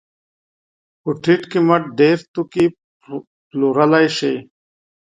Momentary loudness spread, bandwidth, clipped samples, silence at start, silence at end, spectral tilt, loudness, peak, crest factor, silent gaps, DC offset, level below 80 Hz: 17 LU; 9.4 kHz; under 0.1%; 1.05 s; 0.7 s; -6.5 dB/octave; -17 LUFS; 0 dBFS; 18 dB; 2.28-2.34 s, 2.84-3.00 s, 3.27-3.51 s; under 0.1%; -62 dBFS